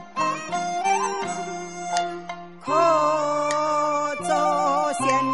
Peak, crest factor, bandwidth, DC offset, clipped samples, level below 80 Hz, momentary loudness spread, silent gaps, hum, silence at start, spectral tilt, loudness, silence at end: -6 dBFS; 16 dB; 11.5 kHz; 0.4%; under 0.1%; -66 dBFS; 11 LU; none; none; 0 s; -3.5 dB/octave; -23 LUFS; 0 s